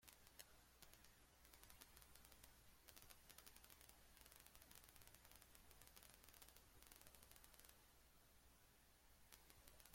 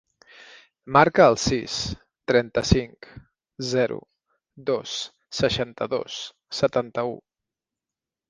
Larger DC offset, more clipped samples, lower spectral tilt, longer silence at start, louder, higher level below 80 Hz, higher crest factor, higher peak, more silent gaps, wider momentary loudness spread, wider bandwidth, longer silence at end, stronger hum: neither; neither; second, -2 dB/octave vs -4.5 dB/octave; second, 0 s vs 0.85 s; second, -66 LUFS vs -23 LUFS; second, -76 dBFS vs -44 dBFS; first, 32 dB vs 24 dB; second, -36 dBFS vs 0 dBFS; neither; second, 3 LU vs 16 LU; first, 16.5 kHz vs 10 kHz; second, 0 s vs 1.1 s; neither